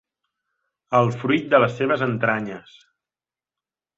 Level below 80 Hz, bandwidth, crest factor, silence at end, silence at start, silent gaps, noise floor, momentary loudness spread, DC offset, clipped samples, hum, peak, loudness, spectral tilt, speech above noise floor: -62 dBFS; 7.8 kHz; 22 dB; 1.4 s; 0.9 s; none; under -90 dBFS; 10 LU; under 0.1%; under 0.1%; none; -2 dBFS; -21 LUFS; -7 dB/octave; over 69 dB